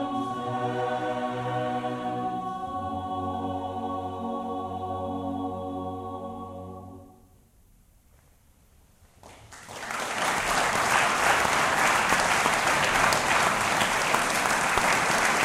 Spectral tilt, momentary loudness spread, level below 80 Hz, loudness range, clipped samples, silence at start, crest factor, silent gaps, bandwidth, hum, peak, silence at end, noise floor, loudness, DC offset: -2.5 dB/octave; 14 LU; -52 dBFS; 17 LU; under 0.1%; 0 s; 22 dB; none; 16.5 kHz; none; -4 dBFS; 0 s; -59 dBFS; -26 LUFS; under 0.1%